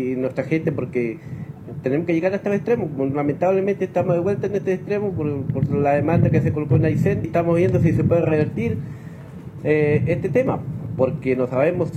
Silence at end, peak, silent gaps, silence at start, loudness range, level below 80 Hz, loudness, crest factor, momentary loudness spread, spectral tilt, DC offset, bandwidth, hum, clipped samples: 0 s; -6 dBFS; none; 0 s; 3 LU; -48 dBFS; -21 LUFS; 14 dB; 11 LU; -9.5 dB/octave; under 0.1%; 13 kHz; none; under 0.1%